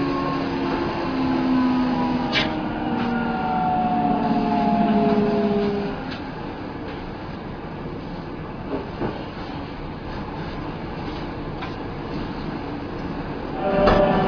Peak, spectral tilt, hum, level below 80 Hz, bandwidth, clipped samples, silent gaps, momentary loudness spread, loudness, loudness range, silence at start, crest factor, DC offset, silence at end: -4 dBFS; -7.5 dB/octave; none; -40 dBFS; 5.4 kHz; under 0.1%; none; 13 LU; -24 LUFS; 10 LU; 0 s; 20 dB; under 0.1%; 0 s